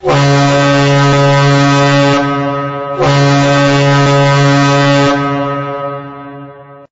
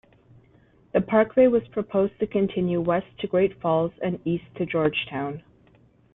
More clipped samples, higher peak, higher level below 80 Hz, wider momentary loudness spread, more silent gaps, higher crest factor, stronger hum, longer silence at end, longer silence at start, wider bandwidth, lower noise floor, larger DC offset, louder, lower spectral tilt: neither; about the same, -4 dBFS vs -6 dBFS; first, -40 dBFS vs -58 dBFS; about the same, 10 LU vs 9 LU; neither; second, 6 dB vs 18 dB; neither; second, 0.2 s vs 0.75 s; second, 0.05 s vs 0.95 s; first, 8 kHz vs 4 kHz; second, -32 dBFS vs -58 dBFS; neither; first, -10 LUFS vs -24 LUFS; second, -6 dB/octave vs -10.5 dB/octave